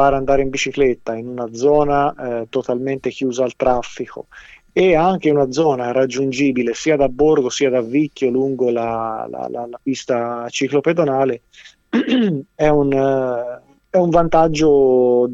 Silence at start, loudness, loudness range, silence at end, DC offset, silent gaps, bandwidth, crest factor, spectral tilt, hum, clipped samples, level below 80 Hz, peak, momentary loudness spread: 0 s; -17 LUFS; 4 LU; 0 s; under 0.1%; none; 8 kHz; 16 dB; -5.5 dB/octave; none; under 0.1%; -40 dBFS; 0 dBFS; 12 LU